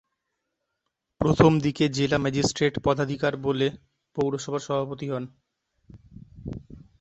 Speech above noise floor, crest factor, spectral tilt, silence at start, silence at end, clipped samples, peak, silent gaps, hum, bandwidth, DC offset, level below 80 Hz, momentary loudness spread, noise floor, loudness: 57 dB; 24 dB; -6 dB/octave; 1.2 s; 0.25 s; under 0.1%; -2 dBFS; none; none; 8.4 kHz; under 0.1%; -50 dBFS; 19 LU; -81 dBFS; -25 LUFS